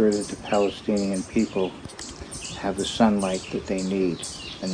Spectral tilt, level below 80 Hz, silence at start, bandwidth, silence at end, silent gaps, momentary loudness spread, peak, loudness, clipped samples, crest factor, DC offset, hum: -5 dB/octave; -50 dBFS; 0 s; 10 kHz; 0 s; none; 13 LU; -6 dBFS; -26 LUFS; under 0.1%; 20 dB; under 0.1%; none